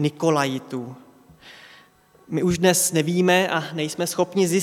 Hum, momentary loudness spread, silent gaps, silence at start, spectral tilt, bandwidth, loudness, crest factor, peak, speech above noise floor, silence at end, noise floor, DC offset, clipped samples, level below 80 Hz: none; 12 LU; none; 0 s; -4 dB/octave; 17 kHz; -21 LUFS; 20 dB; -2 dBFS; 33 dB; 0 s; -54 dBFS; under 0.1%; under 0.1%; -56 dBFS